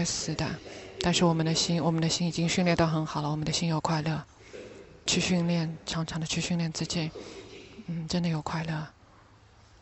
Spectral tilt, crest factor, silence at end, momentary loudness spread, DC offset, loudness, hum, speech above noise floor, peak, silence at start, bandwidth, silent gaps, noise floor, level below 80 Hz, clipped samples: -4.5 dB/octave; 20 dB; 0.9 s; 19 LU; under 0.1%; -29 LUFS; none; 28 dB; -10 dBFS; 0 s; 8.4 kHz; none; -57 dBFS; -54 dBFS; under 0.1%